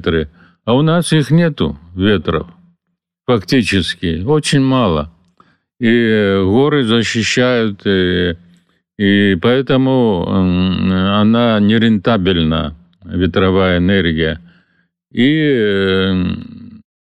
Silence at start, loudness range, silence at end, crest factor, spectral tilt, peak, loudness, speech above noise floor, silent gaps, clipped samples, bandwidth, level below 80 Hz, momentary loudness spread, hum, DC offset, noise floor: 0 s; 3 LU; 0.4 s; 10 dB; -6 dB/octave; -4 dBFS; -14 LUFS; 60 dB; none; under 0.1%; 12.5 kHz; -38 dBFS; 9 LU; none; under 0.1%; -73 dBFS